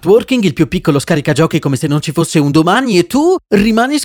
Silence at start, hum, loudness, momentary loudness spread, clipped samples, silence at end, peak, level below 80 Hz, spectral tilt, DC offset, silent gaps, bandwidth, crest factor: 0.05 s; none; -12 LUFS; 4 LU; under 0.1%; 0 s; 0 dBFS; -40 dBFS; -5.5 dB/octave; under 0.1%; none; 19 kHz; 12 dB